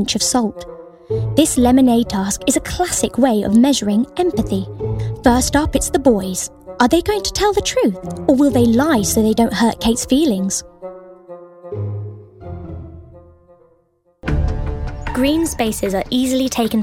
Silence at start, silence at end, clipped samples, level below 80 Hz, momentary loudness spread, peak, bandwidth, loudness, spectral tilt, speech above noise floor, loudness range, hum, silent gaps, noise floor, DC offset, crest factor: 0 s; 0 s; under 0.1%; -32 dBFS; 18 LU; 0 dBFS; 16.5 kHz; -17 LUFS; -4.5 dB/octave; 44 dB; 12 LU; none; none; -59 dBFS; under 0.1%; 16 dB